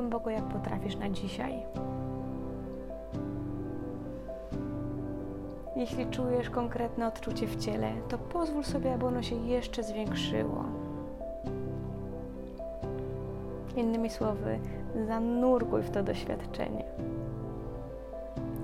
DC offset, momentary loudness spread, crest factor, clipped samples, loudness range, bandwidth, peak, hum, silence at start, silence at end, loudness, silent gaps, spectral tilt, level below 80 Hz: under 0.1%; 10 LU; 18 dB; under 0.1%; 7 LU; 15.5 kHz; -16 dBFS; none; 0 s; 0 s; -35 LUFS; none; -7 dB/octave; -46 dBFS